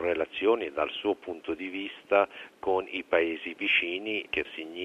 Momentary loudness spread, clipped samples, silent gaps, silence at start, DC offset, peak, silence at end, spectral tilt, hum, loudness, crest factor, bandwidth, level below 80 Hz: 10 LU; under 0.1%; none; 0 s; under 0.1%; -8 dBFS; 0 s; -5 dB/octave; none; -29 LUFS; 20 dB; 10.5 kHz; -64 dBFS